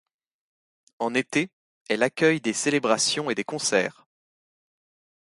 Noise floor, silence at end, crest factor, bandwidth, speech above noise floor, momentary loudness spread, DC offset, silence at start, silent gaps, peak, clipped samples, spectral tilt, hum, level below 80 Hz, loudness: under -90 dBFS; 1.3 s; 22 dB; 11.5 kHz; over 66 dB; 8 LU; under 0.1%; 1 s; 1.53-1.85 s; -6 dBFS; under 0.1%; -3 dB/octave; none; -72 dBFS; -24 LUFS